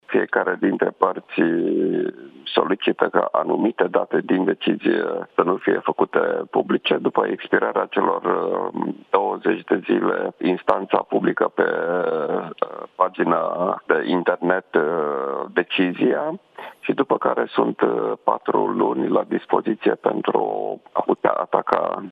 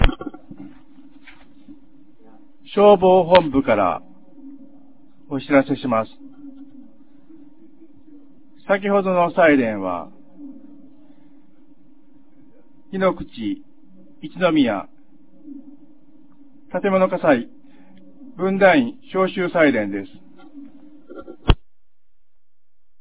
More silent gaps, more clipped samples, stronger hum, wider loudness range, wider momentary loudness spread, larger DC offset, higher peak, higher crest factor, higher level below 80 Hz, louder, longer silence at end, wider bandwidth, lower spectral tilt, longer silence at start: neither; neither; neither; second, 1 LU vs 11 LU; second, 4 LU vs 26 LU; second, under 0.1% vs 1%; about the same, 0 dBFS vs 0 dBFS; about the same, 20 dB vs 22 dB; second, -70 dBFS vs -36 dBFS; about the same, -21 LUFS vs -19 LUFS; second, 0 s vs 1.45 s; first, 4.9 kHz vs 4 kHz; second, -8 dB/octave vs -10 dB/octave; about the same, 0.1 s vs 0 s